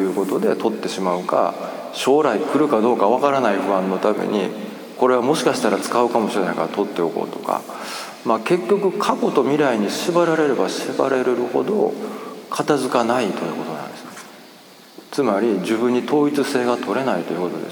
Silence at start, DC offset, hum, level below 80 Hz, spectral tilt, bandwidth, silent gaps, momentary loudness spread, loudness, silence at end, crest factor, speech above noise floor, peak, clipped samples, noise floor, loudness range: 0 s; under 0.1%; none; -72 dBFS; -5 dB/octave; over 20 kHz; none; 11 LU; -20 LUFS; 0 s; 18 dB; 25 dB; -2 dBFS; under 0.1%; -44 dBFS; 4 LU